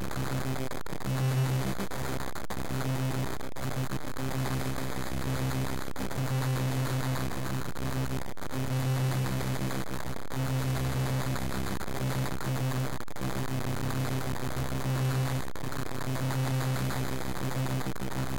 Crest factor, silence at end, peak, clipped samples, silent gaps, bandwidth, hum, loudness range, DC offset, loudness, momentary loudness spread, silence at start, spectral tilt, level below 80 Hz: 12 dB; 0 s; -22 dBFS; under 0.1%; none; 17 kHz; none; 2 LU; 2%; -33 LUFS; 6 LU; 0 s; -5.5 dB/octave; -46 dBFS